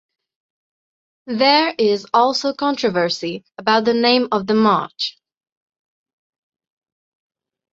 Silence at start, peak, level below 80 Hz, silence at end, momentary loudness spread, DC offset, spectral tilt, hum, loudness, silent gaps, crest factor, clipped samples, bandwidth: 1.25 s; -2 dBFS; -66 dBFS; 2.65 s; 10 LU; under 0.1%; -4.5 dB/octave; none; -17 LUFS; none; 18 dB; under 0.1%; 7.8 kHz